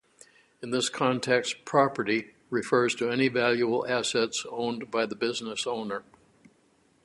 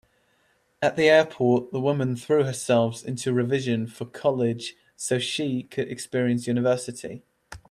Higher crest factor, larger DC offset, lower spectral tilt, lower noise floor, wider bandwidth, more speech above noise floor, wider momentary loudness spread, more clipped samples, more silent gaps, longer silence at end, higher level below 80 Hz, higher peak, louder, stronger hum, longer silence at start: about the same, 20 dB vs 18 dB; neither; second, -4 dB/octave vs -5.5 dB/octave; about the same, -65 dBFS vs -66 dBFS; second, 11.5 kHz vs 13 kHz; second, 38 dB vs 43 dB; second, 8 LU vs 14 LU; neither; neither; first, 1.05 s vs 0.15 s; second, -70 dBFS vs -64 dBFS; about the same, -8 dBFS vs -6 dBFS; second, -28 LUFS vs -24 LUFS; neither; second, 0.6 s vs 0.8 s